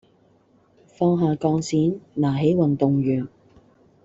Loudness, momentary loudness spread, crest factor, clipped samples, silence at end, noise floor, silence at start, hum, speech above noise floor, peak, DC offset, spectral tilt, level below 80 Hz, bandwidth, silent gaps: -22 LUFS; 5 LU; 18 dB; under 0.1%; 0.8 s; -59 dBFS; 1 s; none; 38 dB; -6 dBFS; under 0.1%; -8 dB/octave; -56 dBFS; 8 kHz; none